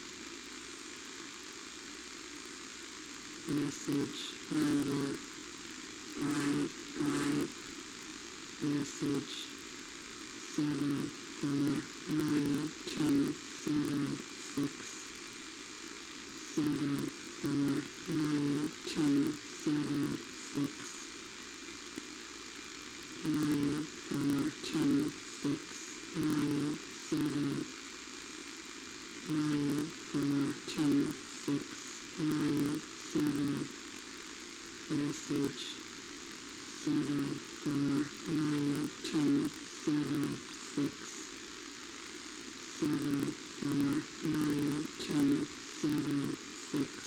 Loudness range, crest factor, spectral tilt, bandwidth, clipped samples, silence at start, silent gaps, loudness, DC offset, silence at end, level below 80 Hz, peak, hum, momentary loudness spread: 5 LU; 16 dB; -4.5 dB/octave; 17.5 kHz; under 0.1%; 0 s; none; -37 LUFS; under 0.1%; 0 s; -68 dBFS; -20 dBFS; none; 12 LU